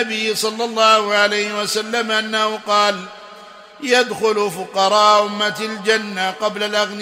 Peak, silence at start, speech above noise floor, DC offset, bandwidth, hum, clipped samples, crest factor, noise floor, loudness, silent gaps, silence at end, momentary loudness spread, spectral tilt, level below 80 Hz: 0 dBFS; 0 s; 22 dB; under 0.1%; 16 kHz; none; under 0.1%; 18 dB; -40 dBFS; -17 LUFS; none; 0 s; 8 LU; -2 dB/octave; -70 dBFS